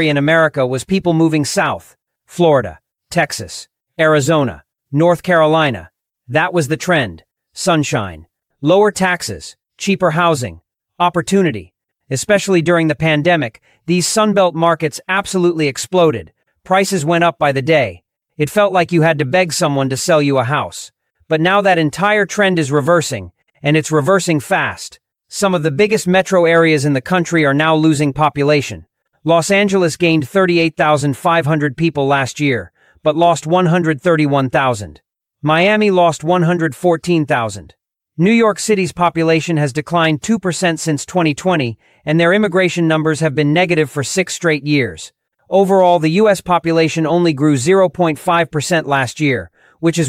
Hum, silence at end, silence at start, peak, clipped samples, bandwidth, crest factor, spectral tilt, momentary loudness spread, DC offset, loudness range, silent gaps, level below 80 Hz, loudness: none; 0 s; 0 s; 0 dBFS; under 0.1%; 16 kHz; 14 dB; -5 dB/octave; 10 LU; under 0.1%; 3 LU; none; -50 dBFS; -14 LUFS